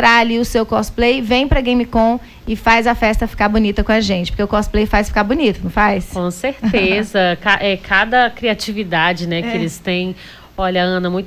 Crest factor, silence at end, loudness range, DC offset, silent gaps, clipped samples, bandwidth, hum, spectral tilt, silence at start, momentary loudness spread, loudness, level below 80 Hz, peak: 12 dB; 0 s; 1 LU; under 0.1%; none; under 0.1%; 16 kHz; none; -5 dB/octave; 0 s; 8 LU; -16 LUFS; -28 dBFS; -2 dBFS